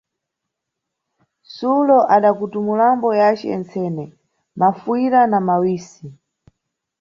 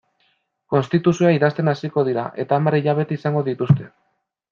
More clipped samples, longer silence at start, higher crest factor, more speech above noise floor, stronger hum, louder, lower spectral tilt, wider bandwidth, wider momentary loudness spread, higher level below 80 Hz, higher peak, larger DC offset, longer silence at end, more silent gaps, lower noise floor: neither; first, 1.5 s vs 0.7 s; about the same, 16 dB vs 18 dB; first, 64 dB vs 47 dB; neither; first, -17 LUFS vs -20 LUFS; about the same, -7.5 dB/octave vs -8 dB/octave; about the same, 7.4 kHz vs 7.2 kHz; first, 12 LU vs 6 LU; about the same, -64 dBFS vs -62 dBFS; about the same, -2 dBFS vs -2 dBFS; neither; first, 0.85 s vs 0.65 s; neither; first, -80 dBFS vs -66 dBFS